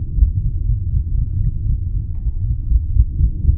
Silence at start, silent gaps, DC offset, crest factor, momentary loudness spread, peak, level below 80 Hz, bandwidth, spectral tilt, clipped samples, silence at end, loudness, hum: 0 s; none; under 0.1%; 16 dB; 6 LU; 0 dBFS; -18 dBFS; 0.6 kHz; -16.5 dB/octave; under 0.1%; 0 s; -21 LUFS; none